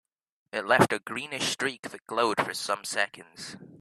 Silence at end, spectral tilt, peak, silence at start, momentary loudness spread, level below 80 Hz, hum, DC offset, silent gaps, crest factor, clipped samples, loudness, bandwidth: 0.05 s; -3 dB/octave; -6 dBFS; 0.55 s; 19 LU; -68 dBFS; none; under 0.1%; 1.79-1.83 s; 24 dB; under 0.1%; -28 LUFS; 14.5 kHz